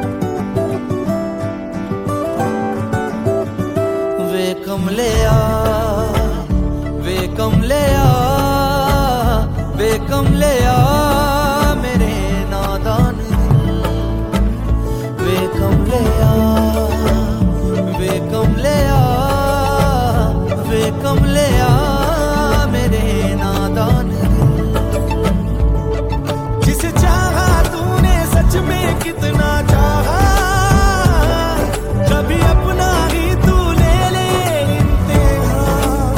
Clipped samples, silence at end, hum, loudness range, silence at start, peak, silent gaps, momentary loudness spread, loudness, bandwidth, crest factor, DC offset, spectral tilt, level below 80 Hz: under 0.1%; 0 s; none; 3 LU; 0 s; -2 dBFS; none; 6 LU; -15 LUFS; 17 kHz; 12 dB; under 0.1%; -6 dB/octave; -20 dBFS